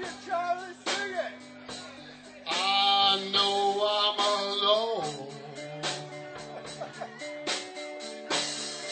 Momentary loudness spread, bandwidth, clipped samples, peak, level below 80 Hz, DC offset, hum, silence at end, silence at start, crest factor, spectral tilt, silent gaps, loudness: 18 LU; 9.2 kHz; under 0.1%; -12 dBFS; -74 dBFS; under 0.1%; none; 0 s; 0 s; 18 dB; -1.5 dB/octave; none; -28 LUFS